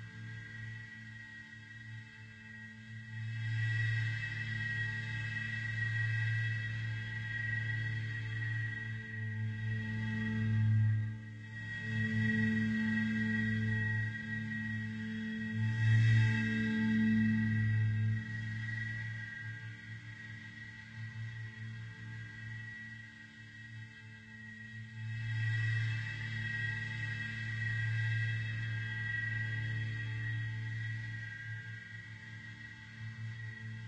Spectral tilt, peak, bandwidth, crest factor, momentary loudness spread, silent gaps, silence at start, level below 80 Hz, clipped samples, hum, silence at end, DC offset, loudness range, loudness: -7 dB/octave; -20 dBFS; 8.2 kHz; 18 dB; 16 LU; none; 0 s; -62 dBFS; under 0.1%; none; 0 s; under 0.1%; 13 LU; -36 LUFS